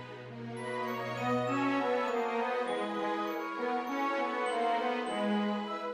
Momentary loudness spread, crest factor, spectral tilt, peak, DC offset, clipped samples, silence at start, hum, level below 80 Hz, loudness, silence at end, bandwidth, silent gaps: 6 LU; 12 dB; -5.5 dB/octave; -20 dBFS; under 0.1%; under 0.1%; 0 s; none; -78 dBFS; -33 LUFS; 0 s; 14.5 kHz; none